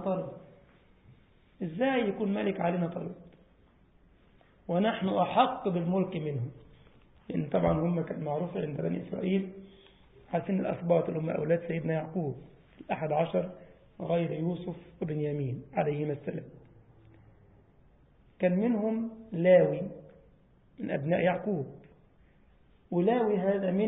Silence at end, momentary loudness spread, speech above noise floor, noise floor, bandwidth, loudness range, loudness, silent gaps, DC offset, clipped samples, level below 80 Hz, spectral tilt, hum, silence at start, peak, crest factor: 0 s; 14 LU; 33 dB; -62 dBFS; 4 kHz; 5 LU; -31 LUFS; none; under 0.1%; under 0.1%; -60 dBFS; -11 dB/octave; none; 0 s; -10 dBFS; 22 dB